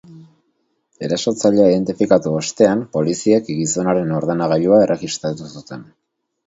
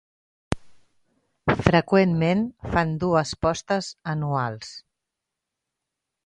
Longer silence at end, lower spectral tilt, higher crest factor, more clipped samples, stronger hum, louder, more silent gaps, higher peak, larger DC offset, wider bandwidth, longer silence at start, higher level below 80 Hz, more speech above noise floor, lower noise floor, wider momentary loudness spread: second, 0.65 s vs 1.45 s; about the same, -5.5 dB/octave vs -6.5 dB/octave; second, 18 dB vs 24 dB; neither; neither; first, -17 LUFS vs -24 LUFS; neither; about the same, 0 dBFS vs 0 dBFS; neither; second, 8 kHz vs 11 kHz; second, 0.1 s vs 0.5 s; second, -56 dBFS vs -46 dBFS; second, 51 dB vs 61 dB; second, -67 dBFS vs -84 dBFS; first, 16 LU vs 13 LU